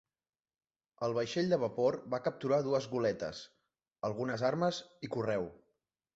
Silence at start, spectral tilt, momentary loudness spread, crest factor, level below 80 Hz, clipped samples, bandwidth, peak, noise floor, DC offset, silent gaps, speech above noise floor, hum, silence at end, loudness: 1 s; -5 dB/octave; 10 LU; 18 dB; -70 dBFS; under 0.1%; 8 kHz; -16 dBFS; under -90 dBFS; under 0.1%; none; over 56 dB; none; 0.6 s; -34 LUFS